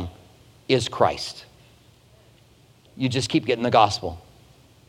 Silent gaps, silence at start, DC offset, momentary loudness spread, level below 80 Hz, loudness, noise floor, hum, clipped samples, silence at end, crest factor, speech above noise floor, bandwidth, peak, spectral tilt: none; 0 s; under 0.1%; 21 LU; -54 dBFS; -23 LUFS; -55 dBFS; none; under 0.1%; 0.7 s; 24 dB; 33 dB; 16 kHz; -2 dBFS; -5 dB/octave